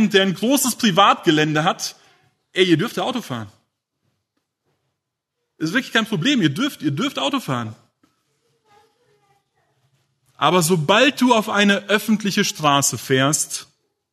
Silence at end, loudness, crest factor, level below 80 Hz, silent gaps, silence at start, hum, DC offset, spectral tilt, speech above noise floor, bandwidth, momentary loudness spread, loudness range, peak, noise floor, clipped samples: 0.5 s; -18 LUFS; 20 dB; -66 dBFS; none; 0 s; none; under 0.1%; -3.5 dB/octave; 60 dB; 13.5 kHz; 12 LU; 10 LU; 0 dBFS; -79 dBFS; under 0.1%